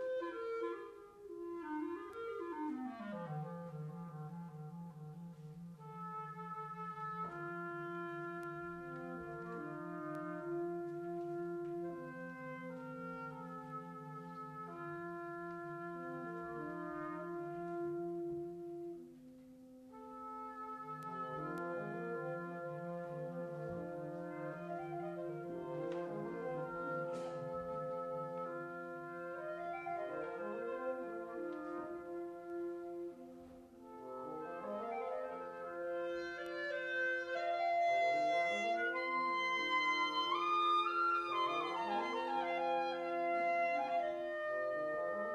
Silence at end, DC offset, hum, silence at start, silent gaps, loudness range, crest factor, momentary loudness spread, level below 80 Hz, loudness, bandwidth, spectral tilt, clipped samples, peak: 0 s; under 0.1%; none; 0 s; none; 12 LU; 16 dB; 14 LU; -78 dBFS; -41 LUFS; 13.5 kHz; -6 dB/octave; under 0.1%; -26 dBFS